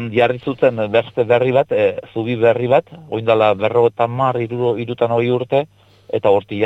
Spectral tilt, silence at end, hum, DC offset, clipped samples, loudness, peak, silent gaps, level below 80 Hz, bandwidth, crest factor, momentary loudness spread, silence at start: -8.5 dB/octave; 0 s; none; under 0.1%; under 0.1%; -17 LUFS; -2 dBFS; none; -58 dBFS; 7.6 kHz; 16 dB; 6 LU; 0 s